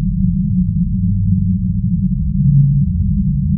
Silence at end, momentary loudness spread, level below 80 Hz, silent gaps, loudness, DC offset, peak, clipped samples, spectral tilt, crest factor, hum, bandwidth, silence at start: 0 s; 5 LU; -22 dBFS; none; -16 LUFS; under 0.1%; -2 dBFS; under 0.1%; -18 dB/octave; 12 dB; none; 0.3 kHz; 0 s